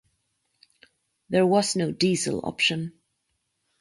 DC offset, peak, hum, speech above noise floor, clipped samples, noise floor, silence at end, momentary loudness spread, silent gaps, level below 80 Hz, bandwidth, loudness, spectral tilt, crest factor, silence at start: under 0.1%; -10 dBFS; none; 53 dB; under 0.1%; -76 dBFS; 0.9 s; 8 LU; none; -64 dBFS; 11.5 kHz; -24 LUFS; -4 dB/octave; 18 dB; 1.3 s